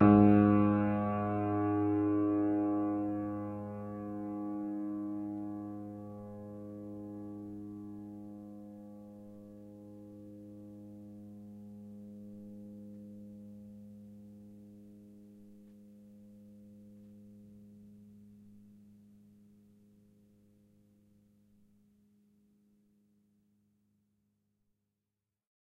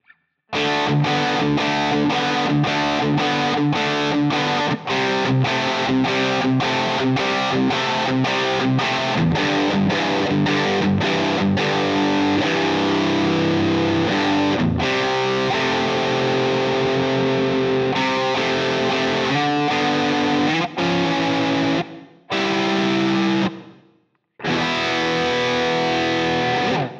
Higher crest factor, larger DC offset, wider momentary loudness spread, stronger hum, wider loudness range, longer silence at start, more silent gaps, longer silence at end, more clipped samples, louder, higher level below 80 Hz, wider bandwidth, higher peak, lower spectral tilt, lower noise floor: first, 24 dB vs 12 dB; neither; first, 25 LU vs 1 LU; neither; first, 24 LU vs 2 LU; second, 0 s vs 0.5 s; neither; first, 7.05 s vs 0 s; neither; second, -33 LUFS vs -19 LUFS; second, -66 dBFS vs -50 dBFS; second, 3.9 kHz vs 8.4 kHz; second, -12 dBFS vs -8 dBFS; first, -11 dB/octave vs -5.5 dB/octave; first, -89 dBFS vs -62 dBFS